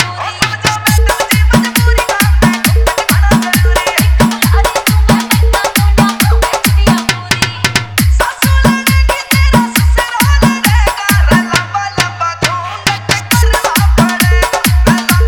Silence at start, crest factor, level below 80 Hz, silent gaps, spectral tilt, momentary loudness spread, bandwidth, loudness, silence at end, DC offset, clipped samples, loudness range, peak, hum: 0 s; 10 dB; -14 dBFS; none; -4.5 dB/octave; 4 LU; over 20 kHz; -10 LUFS; 0 s; under 0.1%; 0.4%; 2 LU; 0 dBFS; none